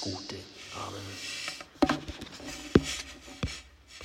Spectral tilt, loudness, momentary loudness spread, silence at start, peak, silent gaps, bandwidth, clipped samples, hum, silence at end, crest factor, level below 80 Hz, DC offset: -4.5 dB/octave; -33 LUFS; 15 LU; 0 s; -4 dBFS; none; 16 kHz; under 0.1%; none; 0 s; 30 dB; -48 dBFS; under 0.1%